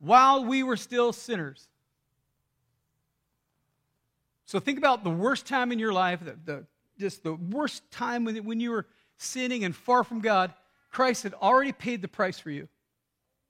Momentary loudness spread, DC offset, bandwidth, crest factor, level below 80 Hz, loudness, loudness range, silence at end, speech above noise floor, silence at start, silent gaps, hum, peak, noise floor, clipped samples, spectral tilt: 14 LU; under 0.1%; 16 kHz; 22 dB; -76 dBFS; -27 LUFS; 7 LU; 0.85 s; 54 dB; 0 s; none; none; -6 dBFS; -81 dBFS; under 0.1%; -4.5 dB/octave